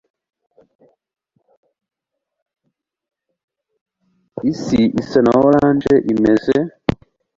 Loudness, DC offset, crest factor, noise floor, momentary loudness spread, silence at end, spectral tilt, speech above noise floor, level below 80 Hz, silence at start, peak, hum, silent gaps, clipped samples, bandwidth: -15 LUFS; under 0.1%; 18 dB; -79 dBFS; 11 LU; 0.45 s; -7.5 dB/octave; 65 dB; -46 dBFS; 4.35 s; 0 dBFS; none; none; under 0.1%; 7.6 kHz